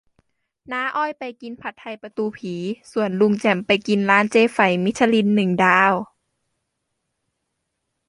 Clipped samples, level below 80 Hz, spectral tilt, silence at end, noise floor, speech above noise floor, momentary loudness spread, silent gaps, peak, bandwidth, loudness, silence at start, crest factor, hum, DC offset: under 0.1%; -64 dBFS; -5.5 dB/octave; 2.05 s; -77 dBFS; 57 dB; 17 LU; none; -2 dBFS; 11.5 kHz; -19 LUFS; 0.7 s; 20 dB; none; under 0.1%